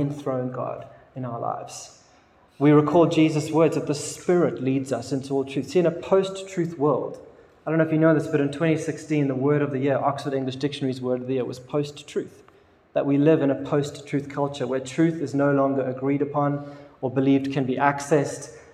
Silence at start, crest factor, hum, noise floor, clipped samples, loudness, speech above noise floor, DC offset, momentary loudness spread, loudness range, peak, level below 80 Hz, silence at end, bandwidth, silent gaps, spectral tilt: 0 s; 20 dB; none; -56 dBFS; under 0.1%; -24 LUFS; 33 dB; under 0.1%; 13 LU; 4 LU; -2 dBFS; -66 dBFS; 0.15 s; 12.5 kHz; none; -6.5 dB/octave